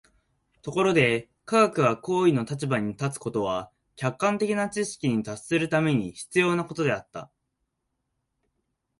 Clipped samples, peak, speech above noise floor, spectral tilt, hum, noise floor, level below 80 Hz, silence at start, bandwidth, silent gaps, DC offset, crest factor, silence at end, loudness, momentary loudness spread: under 0.1%; -6 dBFS; 54 dB; -5.5 dB/octave; none; -79 dBFS; -62 dBFS; 0.65 s; 11.5 kHz; none; under 0.1%; 20 dB; 1.75 s; -25 LUFS; 10 LU